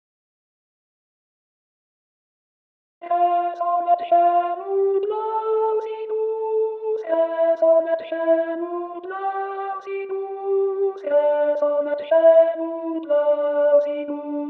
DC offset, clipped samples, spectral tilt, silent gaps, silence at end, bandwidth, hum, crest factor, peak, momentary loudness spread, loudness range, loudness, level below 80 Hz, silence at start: under 0.1%; under 0.1%; -1.5 dB/octave; none; 0 s; 4.3 kHz; none; 16 dB; -4 dBFS; 11 LU; 6 LU; -21 LUFS; -84 dBFS; 3 s